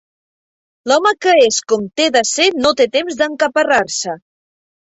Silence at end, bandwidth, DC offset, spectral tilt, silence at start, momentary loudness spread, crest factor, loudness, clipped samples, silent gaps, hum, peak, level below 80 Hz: 0.75 s; 8.4 kHz; under 0.1%; -1.5 dB/octave; 0.85 s; 9 LU; 14 dB; -14 LUFS; under 0.1%; none; none; -2 dBFS; -58 dBFS